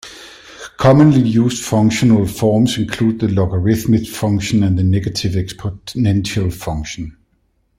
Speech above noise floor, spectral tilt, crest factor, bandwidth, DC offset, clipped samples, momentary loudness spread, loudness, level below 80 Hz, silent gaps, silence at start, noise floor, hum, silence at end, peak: 47 dB; -6.5 dB/octave; 16 dB; 16 kHz; under 0.1%; under 0.1%; 15 LU; -15 LUFS; -40 dBFS; none; 0.05 s; -62 dBFS; none; 0.65 s; 0 dBFS